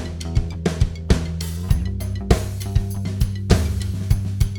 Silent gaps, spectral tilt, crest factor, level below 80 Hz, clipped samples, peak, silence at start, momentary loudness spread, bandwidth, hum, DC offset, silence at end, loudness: none; -6.5 dB/octave; 20 dB; -24 dBFS; under 0.1%; 0 dBFS; 0 s; 6 LU; 19 kHz; none; under 0.1%; 0 s; -23 LUFS